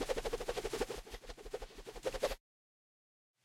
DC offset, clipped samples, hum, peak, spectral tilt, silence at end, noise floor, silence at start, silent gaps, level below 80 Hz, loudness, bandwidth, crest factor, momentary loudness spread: under 0.1%; under 0.1%; none; -22 dBFS; -3 dB/octave; 1.05 s; under -90 dBFS; 0 s; none; -52 dBFS; -42 LUFS; 16.5 kHz; 22 dB; 11 LU